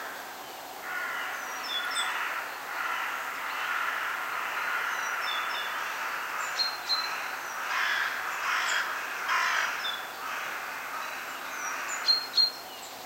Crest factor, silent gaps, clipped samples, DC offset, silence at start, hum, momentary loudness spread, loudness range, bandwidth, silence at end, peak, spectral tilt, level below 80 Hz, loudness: 18 dB; none; under 0.1%; under 0.1%; 0 s; none; 9 LU; 3 LU; 16 kHz; 0 s; -14 dBFS; 1 dB/octave; -76 dBFS; -30 LUFS